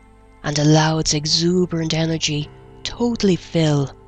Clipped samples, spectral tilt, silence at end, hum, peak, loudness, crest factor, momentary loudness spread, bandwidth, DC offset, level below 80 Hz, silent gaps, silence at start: under 0.1%; -4.5 dB/octave; 0.15 s; none; -2 dBFS; -18 LUFS; 18 dB; 13 LU; 8.8 kHz; under 0.1%; -42 dBFS; none; 0.45 s